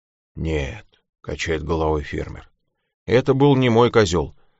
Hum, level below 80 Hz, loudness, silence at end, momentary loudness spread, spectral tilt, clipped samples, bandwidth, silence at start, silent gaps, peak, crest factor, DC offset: none; -36 dBFS; -20 LUFS; 0.3 s; 19 LU; -5.5 dB/octave; under 0.1%; 8 kHz; 0.35 s; 1.09-1.13 s, 2.94-3.06 s; -2 dBFS; 18 dB; under 0.1%